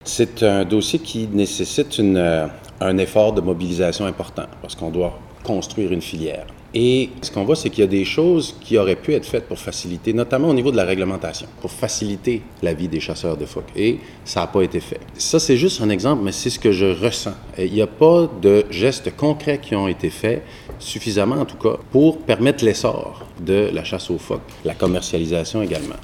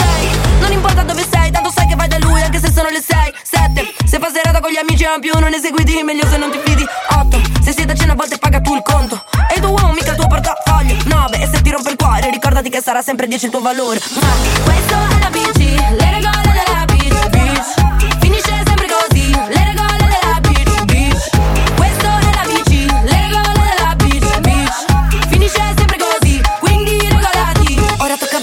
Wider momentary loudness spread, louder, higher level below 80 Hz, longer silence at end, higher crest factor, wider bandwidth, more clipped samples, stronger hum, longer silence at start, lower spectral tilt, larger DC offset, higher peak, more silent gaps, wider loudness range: first, 11 LU vs 2 LU; second, -19 LUFS vs -13 LUFS; second, -44 dBFS vs -14 dBFS; about the same, 0 s vs 0 s; first, 18 dB vs 12 dB; about the same, 16 kHz vs 17 kHz; neither; neither; about the same, 0.05 s vs 0 s; about the same, -5 dB/octave vs -4.5 dB/octave; neither; about the same, 0 dBFS vs 0 dBFS; neither; first, 6 LU vs 1 LU